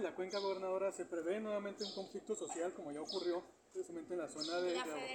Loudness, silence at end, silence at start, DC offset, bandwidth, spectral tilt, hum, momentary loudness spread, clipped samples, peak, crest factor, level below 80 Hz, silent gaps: -42 LUFS; 0 s; 0 s; under 0.1%; 17 kHz; -3.5 dB/octave; none; 8 LU; under 0.1%; -26 dBFS; 16 dB; -86 dBFS; none